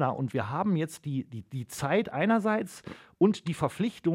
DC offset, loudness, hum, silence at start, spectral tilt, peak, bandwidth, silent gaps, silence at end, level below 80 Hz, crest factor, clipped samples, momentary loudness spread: under 0.1%; -29 LUFS; none; 0 s; -6.5 dB/octave; -12 dBFS; 16.5 kHz; none; 0 s; -64 dBFS; 18 dB; under 0.1%; 13 LU